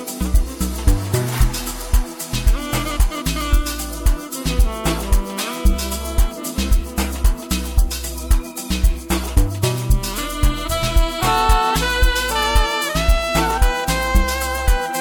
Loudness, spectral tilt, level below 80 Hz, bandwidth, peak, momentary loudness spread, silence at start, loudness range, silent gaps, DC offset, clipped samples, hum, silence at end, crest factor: -20 LUFS; -4 dB/octave; -20 dBFS; 19 kHz; -2 dBFS; 5 LU; 0 s; 4 LU; none; under 0.1%; under 0.1%; none; 0 s; 14 dB